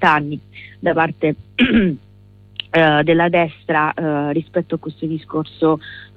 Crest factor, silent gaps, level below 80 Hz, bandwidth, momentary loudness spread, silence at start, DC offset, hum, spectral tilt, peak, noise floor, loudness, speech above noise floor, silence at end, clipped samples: 16 dB; none; -48 dBFS; 6.2 kHz; 13 LU; 0 s; under 0.1%; 50 Hz at -40 dBFS; -8 dB/octave; -2 dBFS; -46 dBFS; -18 LUFS; 28 dB; 0.1 s; under 0.1%